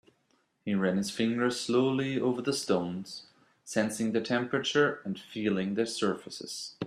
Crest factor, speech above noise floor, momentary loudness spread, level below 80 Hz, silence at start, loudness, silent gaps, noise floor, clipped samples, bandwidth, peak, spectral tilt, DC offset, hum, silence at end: 18 dB; 42 dB; 11 LU; -72 dBFS; 0.65 s; -30 LUFS; none; -72 dBFS; under 0.1%; 14.5 kHz; -12 dBFS; -4.5 dB/octave; under 0.1%; none; 0 s